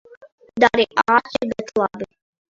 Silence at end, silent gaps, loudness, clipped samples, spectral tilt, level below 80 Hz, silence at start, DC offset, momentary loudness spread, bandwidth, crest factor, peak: 0.5 s; none; -19 LUFS; under 0.1%; -4.5 dB/octave; -56 dBFS; 0.55 s; under 0.1%; 18 LU; 7.8 kHz; 20 dB; 0 dBFS